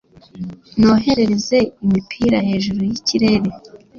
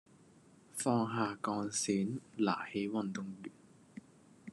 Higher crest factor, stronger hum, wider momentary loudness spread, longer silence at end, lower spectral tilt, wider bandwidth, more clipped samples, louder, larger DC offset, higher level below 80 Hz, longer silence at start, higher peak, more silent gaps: second, 14 dB vs 20 dB; neither; second, 12 LU vs 22 LU; about the same, 0 s vs 0 s; about the same, -5.5 dB/octave vs -4.5 dB/octave; second, 7.2 kHz vs 12 kHz; neither; first, -17 LUFS vs -36 LUFS; neither; first, -44 dBFS vs -82 dBFS; second, 0.35 s vs 0.75 s; first, -2 dBFS vs -18 dBFS; neither